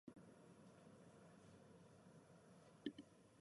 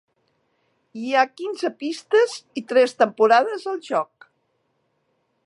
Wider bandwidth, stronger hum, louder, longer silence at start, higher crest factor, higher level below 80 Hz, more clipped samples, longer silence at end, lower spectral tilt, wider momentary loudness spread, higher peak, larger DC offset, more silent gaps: about the same, 11.5 kHz vs 11.5 kHz; neither; second, -62 LUFS vs -21 LUFS; second, 0.05 s vs 0.95 s; first, 28 dB vs 20 dB; about the same, -88 dBFS vs -84 dBFS; neither; second, 0 s vs 1.4 s; first, -5.5 dB/octave vs -3.5 dB/octave; second, 12 LU vs 15 LU; second, -34 dBFS vs -2 dBFS; neither; neither